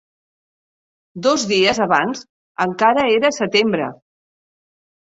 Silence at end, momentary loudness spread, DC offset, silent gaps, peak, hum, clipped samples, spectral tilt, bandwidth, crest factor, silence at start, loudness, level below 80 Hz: 1.1 s; 10 LU; under 0.1%; 2.29-2.55 s; -2 dBFS; none; under 0.1%; -3.5 dB/octave; 8 kHz; 18 dB; 1.15 s; -17 LUFS; -58 dBFS